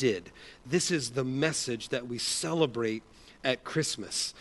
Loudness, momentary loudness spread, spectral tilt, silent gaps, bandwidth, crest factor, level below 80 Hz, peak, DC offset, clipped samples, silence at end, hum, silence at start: -31 LUFS; 7 LU; -3.5 dB/octave; none; 11.5 kHz; 20 dB; -62 dBFS; -12 dBFS; under 0.1%; under 0.1%; 0 s; none; 0 s